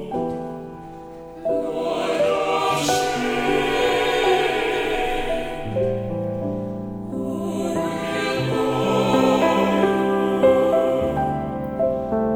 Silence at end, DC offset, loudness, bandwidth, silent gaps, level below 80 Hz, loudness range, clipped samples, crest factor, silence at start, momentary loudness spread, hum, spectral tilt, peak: 0 s; under 0.1%; -21 LUFS; 17 kHz; none; -42 dBFS; 6 LU; under 0.1%; 16 dB; 0 s; 11 LU; none; -5 dB/octave; -4 dBFS